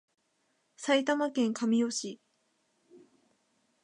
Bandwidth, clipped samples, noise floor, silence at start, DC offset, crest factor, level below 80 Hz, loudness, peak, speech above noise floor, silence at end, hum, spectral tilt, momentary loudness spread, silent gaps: 11 kHz; under 0.1%; -75 dBFS; 0.8 s; under 0.1%; 20 dB; -86 dBFS; -30 LUFS; -14 dBFS; 46 dB; 0.85 s; none; -3.5 dB/octave; 13 LU; none